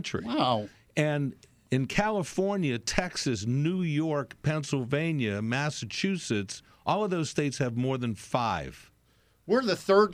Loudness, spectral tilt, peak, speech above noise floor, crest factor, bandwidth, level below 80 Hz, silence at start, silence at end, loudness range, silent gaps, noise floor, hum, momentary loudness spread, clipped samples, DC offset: -29 LUFS; -5.5 dB/octave; -6 dBFS; 37 dB; 22 dB; 15 kHz; -54 dBFS; 0 s; 0 s; 1 LU; none; -65 dBFS; none; 5 LU; under 0.1%; under 0.1%